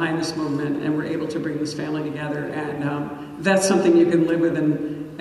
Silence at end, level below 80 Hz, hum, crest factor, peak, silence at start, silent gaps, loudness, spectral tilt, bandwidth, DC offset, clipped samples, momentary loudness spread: 0 s; -58 dBFS; none; 16 dB; -6 dBFS; 0 s; none; -22 LUFS; -5.5 dB/octave; 12 kHz; under 0.1%; under 0.1%; 11 LU